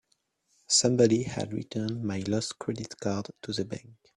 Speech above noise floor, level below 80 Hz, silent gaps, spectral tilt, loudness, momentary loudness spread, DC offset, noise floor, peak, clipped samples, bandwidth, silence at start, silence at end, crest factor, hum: 45 dB; -62 dBFS; none; -4 dB/octave; -29 LUFS; 12 LU; under 0.1%; -74 dBFS; -10 dBFS; under 0.1%; 11.5 kHz; 0.7 s; 0.25 s; 20 dB; none